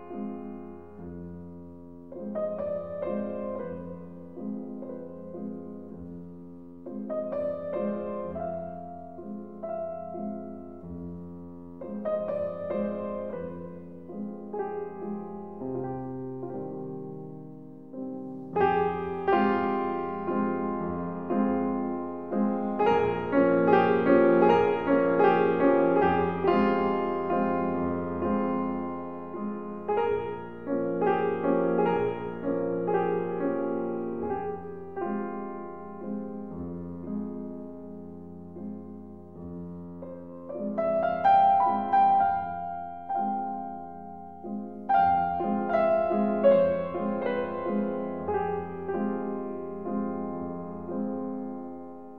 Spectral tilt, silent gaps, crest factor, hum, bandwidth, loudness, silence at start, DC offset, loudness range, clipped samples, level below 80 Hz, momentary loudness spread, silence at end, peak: -9.5 dB/octave; none; 22 dB; none; 5.8 kHz; -28 LUFS; 0 s; 0.3%; 14 LU; under 0.1%; -60 dBFS; 19 LU; 0 s; -6 dBFS